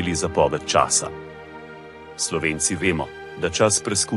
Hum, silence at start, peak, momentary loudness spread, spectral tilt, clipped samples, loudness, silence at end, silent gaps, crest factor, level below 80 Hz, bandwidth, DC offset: none; 0 s; -4 dBFS; 21 LU; -3 dB/octave; under 0.1%; -21 LUFS; 0 s; none; 20 dB; -48 dBFS; 12 kHz; under 0.1%